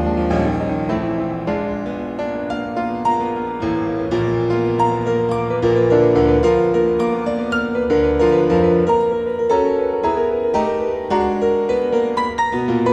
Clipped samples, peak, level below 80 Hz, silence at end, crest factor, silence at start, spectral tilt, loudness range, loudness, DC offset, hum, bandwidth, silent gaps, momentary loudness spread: under 0.1%; -4 dBFS; -36 dBFS; 0 s; 14 dB; 0 s; -7.5 dB/octave; 5 LU; -18 LUFS; under 0.1%; none; 8.8 kHz; none; 8 LU